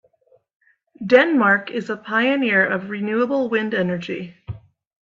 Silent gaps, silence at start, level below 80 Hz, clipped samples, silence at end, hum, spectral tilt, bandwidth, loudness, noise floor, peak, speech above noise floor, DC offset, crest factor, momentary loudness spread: none; 1 s; -60 dBFS; under 0.1%; 0.45 s; none; -7 dB/octave; 7.4 kHz; -19 LUFS; -60 dBFS; 0 dBFS; 40 dB; under 0.1%; 20 dB; 19 LU